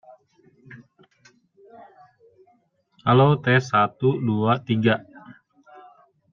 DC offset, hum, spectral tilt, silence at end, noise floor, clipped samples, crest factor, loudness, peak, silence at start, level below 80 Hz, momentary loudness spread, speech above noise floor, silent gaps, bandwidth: under 0.1%; none; -7.5 dB/octave; 1 s; -64 dBFS; under 0.1%; 20 dB; -21 LUFS; -4 dBFS; 0.7 s; -64 dBFS; 6 LU; 44 dB; none; 7.2 kHz